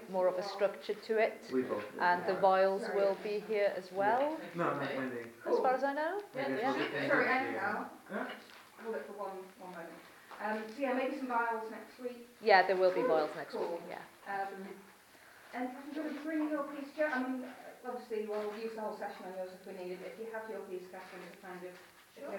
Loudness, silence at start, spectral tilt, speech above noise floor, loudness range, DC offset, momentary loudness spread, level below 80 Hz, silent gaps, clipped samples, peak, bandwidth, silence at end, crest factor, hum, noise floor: -35 LUFS; 0 s; -5.5 dB/octave; 24 dB; 10 LU; under 0.1%; 17 LU; -86 dBFS; none; under 0.1%; -12 dBFS; 17 kHz; 0 s; 24 dB; none; -59 dBFS